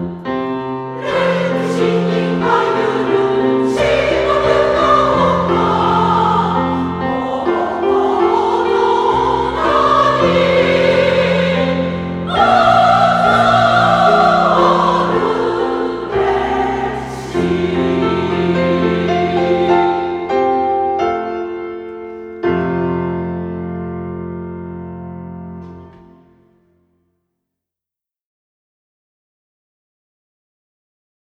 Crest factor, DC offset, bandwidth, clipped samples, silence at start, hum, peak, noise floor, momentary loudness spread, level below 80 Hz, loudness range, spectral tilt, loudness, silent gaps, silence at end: 16 dB; under 0.1%; 11 kHz; under 0.1%; 0 s; none; 0 dBFS; -88 dBFS; 13 LU; -40 dBFS; 10 LU; -6.5 dB/octave; -14 LUFS; none; 5.45 s